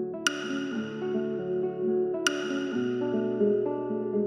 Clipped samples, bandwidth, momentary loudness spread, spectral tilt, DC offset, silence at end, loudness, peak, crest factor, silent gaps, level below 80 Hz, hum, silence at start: under 0.1%; 13.5 kHz; 6 LU; -4 dB/octave; under 0.1%; 0 s; -29 LUFS; -6 dBFS; 22 dB; none; -74 dBFS; none; 0 s